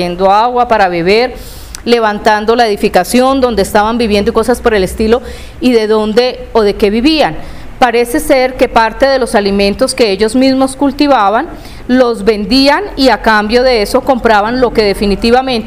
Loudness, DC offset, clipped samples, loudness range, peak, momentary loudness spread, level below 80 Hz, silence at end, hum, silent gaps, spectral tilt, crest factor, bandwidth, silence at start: -10 LUFS; 0.5%; 0.6%; 2 LU; 0 dBFS; 4 LU; -30 dBFS; 0 s; none; none; -4.5 dB/octave; 10 dB; 16 kHz; 0 s